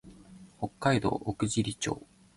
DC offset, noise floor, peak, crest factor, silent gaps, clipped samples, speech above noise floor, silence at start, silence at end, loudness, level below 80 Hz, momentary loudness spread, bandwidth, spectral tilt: under 0.1%; -52 dBFS; -12 dBFS; 20 dB; none; under 0.1%; 22 dB; 0.05 s; 0.35 s; -31 LUFS; -54 dBFS; 12 LU; 11.5 kHz; -5 dB/octave